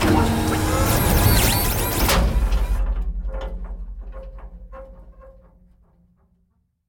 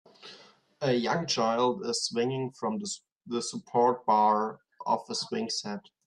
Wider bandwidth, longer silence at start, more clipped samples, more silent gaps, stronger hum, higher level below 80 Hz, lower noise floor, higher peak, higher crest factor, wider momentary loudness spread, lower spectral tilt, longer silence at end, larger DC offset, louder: first, 19.5 kHz vs 11.5 kHz; second, 0 s vs 0.25 s; neither; second, none vs 3.12-3.16 s; neither; first, -26 dBFS vs -76 dBFS; first, -66 dBFS vs -56 dBFS; first, -4 dBFS vs -12 dBFS; about the same, 18 dB vs 18 dB; first, 24 LU vs 14 LU; about the same, -4.5 dB/octave vs -4 dB/octave; first, 1.55 s vs 0.3 s; neither; first, -20 LUFS vs -29 LUFS